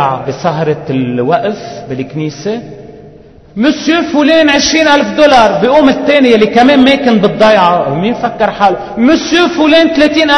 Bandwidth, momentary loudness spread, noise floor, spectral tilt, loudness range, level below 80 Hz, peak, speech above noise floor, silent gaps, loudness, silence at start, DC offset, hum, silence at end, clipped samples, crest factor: 10.5 kHz; 12 LU; -36 dBFS; -4.5 dB/octave; 9 LU; -40 dBFS; 0 dBFS; 27 dB; none; -9 LUFS; 0 s; under 0.1%; none; 0 s; 1%; 8 dB